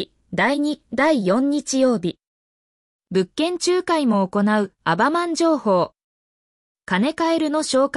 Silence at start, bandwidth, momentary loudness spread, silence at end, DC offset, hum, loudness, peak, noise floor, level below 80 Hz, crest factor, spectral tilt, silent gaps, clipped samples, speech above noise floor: 0 s; 12 kHz; 5 LU; 0 s; under 0.1%; none; -20 LUFS; -8 dBFS; under -90 dBFS; -62 dBFS; 14 dB; -4.5 dB/octave; 2.27-2.99 s, 6.04-6.75 s; under 0.1%; over 71 dB